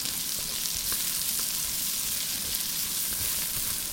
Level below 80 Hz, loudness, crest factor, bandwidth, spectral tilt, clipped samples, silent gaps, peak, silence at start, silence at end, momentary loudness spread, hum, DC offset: -52 dBFS; -27 LUFS; 24 dB; 17 kHz; 0.5 dB/octave; under 0.1%; none; -6 dBFS; 0 s; 0 s; 2 LU; none; under 0.1%